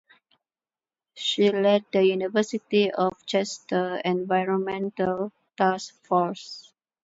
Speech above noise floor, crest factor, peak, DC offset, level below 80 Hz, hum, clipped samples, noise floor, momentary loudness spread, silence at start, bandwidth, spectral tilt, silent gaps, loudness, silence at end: over 66 dB; 18 dB; -8 dBFS; under 0.1%; -70 dBFS; none; under 0.1%; under -90 dBFS; 9 LU; 1.15 s; 8 kHz; -5 dB/octave; none; -25 LUFS; 0.45 s